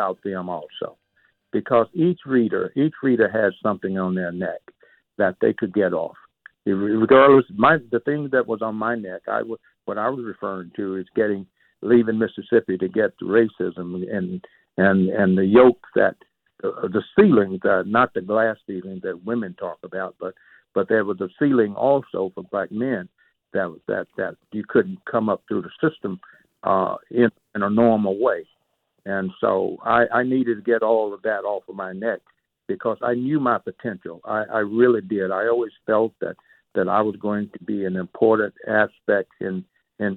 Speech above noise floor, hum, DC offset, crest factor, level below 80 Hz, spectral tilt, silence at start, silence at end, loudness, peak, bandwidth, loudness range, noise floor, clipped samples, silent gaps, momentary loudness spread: 50 dB; none; under 0.1%; 16 dB; -62 dBFS; -10 dB/octave; 0 s; 0 s; -22 LUFS; -4 dBFS; 4.2 kHz; 7 LU; -71 dBFS; under 0.1%; none; 13 LU